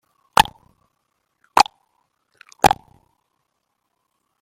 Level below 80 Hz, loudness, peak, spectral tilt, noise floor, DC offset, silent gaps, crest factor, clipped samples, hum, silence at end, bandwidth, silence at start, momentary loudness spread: -48 dBFS; -19 LUFS; 0 dBFS; -2.5 dB/octave; -74 dBFS; under 0.1%; none; 24 dB; under 0.1%; none; 1.7 s; 16.5 kHz; 0.35 s; 4 LU